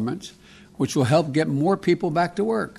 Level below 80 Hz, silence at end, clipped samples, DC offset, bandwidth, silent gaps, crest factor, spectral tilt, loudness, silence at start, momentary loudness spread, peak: -58 dBFS; 0.05 s; under 0.1%; under 0.1%; 13 kHz; none; 16 dB; -6.5 dB/octave; -22 LUFS; 0 s; 9 LU; -6 dBFS